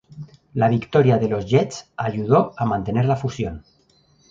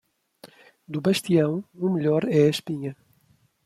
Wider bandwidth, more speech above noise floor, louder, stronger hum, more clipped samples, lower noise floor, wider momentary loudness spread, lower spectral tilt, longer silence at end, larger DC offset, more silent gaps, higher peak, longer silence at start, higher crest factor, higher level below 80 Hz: second, 7.6 kHz vs 14.5 kHz; about the same, 39 dB vs 41 dB; first, -21 LUFS vs -24 LUFS; neither; neither; second, -59 dBFS vs -63 dBFS; about the same, 13 LU vs 12 LU; about the same, -7.5 dB/octave vs -6.5 dB/octave; about the same, 0.7 s vs 0.7 s; neither; neither; first, -2 dBFS vs -6 dBFS; second, 0.1 s vs 0.45 s; about the same, 18 dB vs 18 dB; first, -48 dBFS vs -66 dBFS